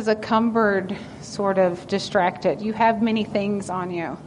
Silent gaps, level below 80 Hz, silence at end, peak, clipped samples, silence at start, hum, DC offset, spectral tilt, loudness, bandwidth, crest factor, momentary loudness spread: none; -56 dBFS; 0 s; -6 dBFS; under 0.1%; 0 s; none; under 0.1%; -6 dB/octave; -22 LUFS; 10.5 kHz; 16 dB; 8 LU